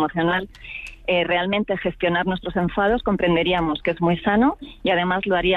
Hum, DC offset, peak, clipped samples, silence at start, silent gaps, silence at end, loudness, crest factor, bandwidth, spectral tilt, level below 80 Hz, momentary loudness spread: none; under 0.1%; -8 dBFS; under 0.1%; 0 s; none; 0 s; -21 LUFS; 12 dB; 5.6 kHz; -7.5 dB/octave; -42 dBFS; 6 LU